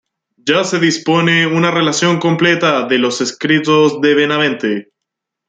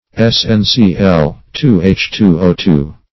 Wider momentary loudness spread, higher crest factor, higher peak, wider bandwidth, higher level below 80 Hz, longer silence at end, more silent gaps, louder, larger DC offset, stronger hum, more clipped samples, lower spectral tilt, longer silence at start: about the same, 6 LU vs 4 LU; about the same, 14 dB vs 12 dB; about the same, 0 dBFS vs 0 dBFS; first, 9.4 kHz vs 6.2 kHz; second, -60 dBFS vs -30 dBFS; first, 0.65 s vs 0.2 s; neither; about the same, -13 LUFS vs -11 LUFS; second, under 0.1% vs 0.9%; neither; second, under 0.1% vs 0.4%; second, -4.5 dB/octave vs -6.5 dB/octave; first, 0.45 s vs 0.15 s